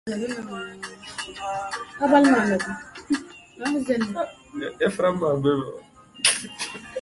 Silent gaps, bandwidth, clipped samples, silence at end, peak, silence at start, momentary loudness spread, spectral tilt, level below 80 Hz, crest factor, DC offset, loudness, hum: none; 11.5 kHz; under 0.1%; 0 s; -4 dBFS; 0.05 s; 16 LU; -4 dB/octave; -60 dBFS; 22 dB; under 0.1%; -24 LUFS; none